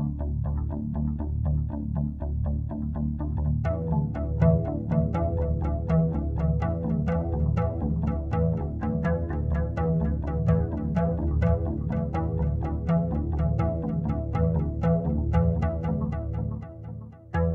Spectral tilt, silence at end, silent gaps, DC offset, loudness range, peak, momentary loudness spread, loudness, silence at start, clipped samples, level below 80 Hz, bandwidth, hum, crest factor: -11 dB/octave; 0 s; none; under 0.1%; 2 LU; -8 dBFS; 6 LU; -27 LUFS; 0 s; under 0.1%; -32 dBFS; 3.6 kHz; none; 16 dB